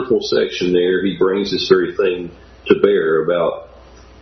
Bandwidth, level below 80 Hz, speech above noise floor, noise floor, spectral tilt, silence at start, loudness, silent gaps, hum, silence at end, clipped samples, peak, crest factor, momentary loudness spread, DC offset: 6.4 kHz; -48 dBFS; 26 dB; -42 dBFS; -5.5 dB/octave; 0 s; -16 LUFS; none; none; 0.55 s; under 0.1%; 0 dBFS; 16 dB; 10 LU; under 0.1%